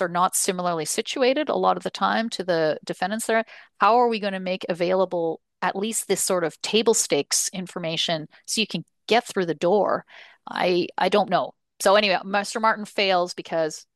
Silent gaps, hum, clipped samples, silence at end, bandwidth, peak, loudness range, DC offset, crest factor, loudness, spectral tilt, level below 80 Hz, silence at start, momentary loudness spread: none; none; under 0.1%; 0.15 s; 12.5 kHz; -4 dBFS; 2 LU; under 0.1%; 18 dB; -23 LUFS; -3 dB/octave; -72 dBFS; 0 s; 8 LU